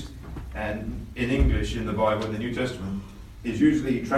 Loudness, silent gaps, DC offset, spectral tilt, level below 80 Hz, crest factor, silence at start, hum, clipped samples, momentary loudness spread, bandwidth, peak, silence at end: -27 LUFS; none; under 0.1%; -7 dB/octave; -34 dBFS; 16 dB; 0 s; none; under 0.1%; 14 LU; 13.5 kHz; -8 dBFS; 0 s